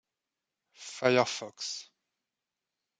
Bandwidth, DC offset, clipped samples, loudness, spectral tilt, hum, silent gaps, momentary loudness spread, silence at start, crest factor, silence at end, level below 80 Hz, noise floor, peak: 9.4 kHz; under 0.1%; under 0.1%; -30 LUFS; -3.5 dB/octave; none; none; 18 LU; 0.8 s; 26 dB; 1.15 s; -84 dBFS; -89 dBFS; -10 dBFS